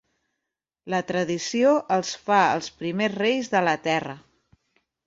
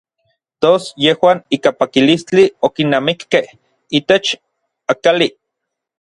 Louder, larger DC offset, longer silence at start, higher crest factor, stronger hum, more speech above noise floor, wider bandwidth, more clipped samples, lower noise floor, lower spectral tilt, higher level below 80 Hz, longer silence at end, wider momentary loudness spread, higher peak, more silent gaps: second, -23 LUFS vs -14 LUFS; neither; first, 0.85 s vs 0.6 s; about the same, 20 dB vs 16 dB; neither; about the same, 61 dB vs 64 dB; second, 7.8 kHz vs 11.5 kHz; neither; first, -85 dBFS vs -78 dBFS; about the same, -4.5 dB/octave vs -5 dB/octave; second, -68 dBFS vs -58 dBFS; about the same, 0.9 s vs 0.85 s; about the same, 9 LU vs 7 LU; second, -4 dBFS vs 0 dBFS; neither